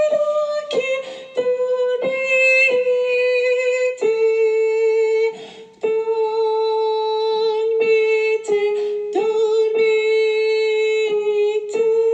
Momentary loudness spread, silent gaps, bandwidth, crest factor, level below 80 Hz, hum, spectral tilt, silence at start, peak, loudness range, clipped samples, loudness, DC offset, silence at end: 6 LU; none; 8.4 kHz; 12 dB; -74 dBFS; none; -2.5 dB/octave; 0 s; -6 dBFS; 3 LU; under 0.1%; -18 LUFS; under 0.1%; 0 s